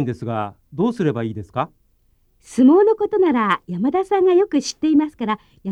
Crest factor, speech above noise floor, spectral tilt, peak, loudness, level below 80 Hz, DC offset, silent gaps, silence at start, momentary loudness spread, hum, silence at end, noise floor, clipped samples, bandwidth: 14 dB; 42 dB; -6.5 dB/octave; -4 dBFS; -19 LUFS; -56 dBFS; under 0.1%; none; 0 s; 12 LU; none; 0 s; -60 dBFS; under 0.1%; 11 kHz